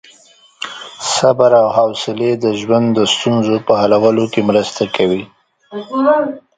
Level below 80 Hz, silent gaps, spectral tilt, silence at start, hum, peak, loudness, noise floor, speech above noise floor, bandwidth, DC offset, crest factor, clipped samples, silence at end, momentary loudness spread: -54 dBFS; none; -4.5 dB/octave; 0.6 s; none; 0 dBFS; -14 LUFS; -47 dBFS; 34 dB; 9.6 kHz; under 0.1%; 14 dB; under 0.1%; 0.2 s; 13 LU